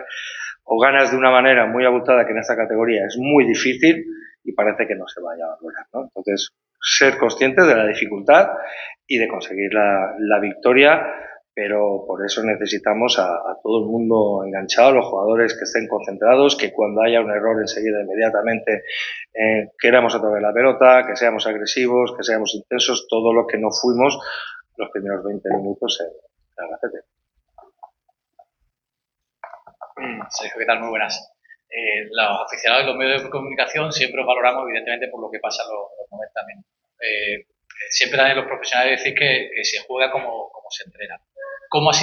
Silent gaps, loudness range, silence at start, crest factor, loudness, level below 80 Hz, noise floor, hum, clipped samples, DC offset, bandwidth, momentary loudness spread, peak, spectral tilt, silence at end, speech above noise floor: none; 10 LU; 0 s; 20 dB; -18 LUFS; -64 dBFS; -83 dBFS; none; under 0.1%; under 0.1%; 7 kHz; 17 LU; 0 dBFS; -3 dB/octave; 0 s; 65 dB